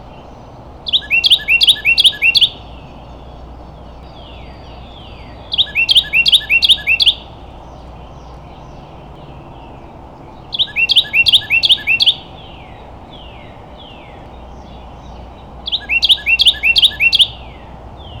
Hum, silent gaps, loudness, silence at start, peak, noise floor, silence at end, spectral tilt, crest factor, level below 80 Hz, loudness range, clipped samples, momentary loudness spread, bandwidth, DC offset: none; none; -10 LUFS; 0 s; -2 dBFS; -35 dBFS; 0 s; -1 dB/octave; 14 dB; -38 dBFS; 10 LU; under 0.1%; 12 LU; over 20 kHz; under 0.1%